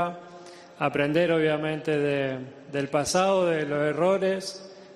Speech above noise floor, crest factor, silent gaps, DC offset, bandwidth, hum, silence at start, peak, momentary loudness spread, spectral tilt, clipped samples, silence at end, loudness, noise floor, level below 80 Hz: 21 dB; 16 dB; none; under 0.1%; 13.5 kHz; none; 0 s; -10 dBFS; 14 LU; -5 dB/octave; under 0.1%; 0 s; -25 LUFS; -46 dBFS; -64 dBFS